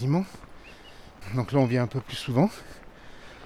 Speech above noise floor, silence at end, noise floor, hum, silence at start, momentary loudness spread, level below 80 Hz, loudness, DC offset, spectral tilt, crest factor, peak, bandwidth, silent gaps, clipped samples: 21 dB; 0 s; -47 dBFS; none; 0 s; 24 LU; -52 dBFS; -27 LUFS; under 0.1%; -7.5 dB/octave; 18 dB; -10 dBFS; 14 kHz; none; under 0.1%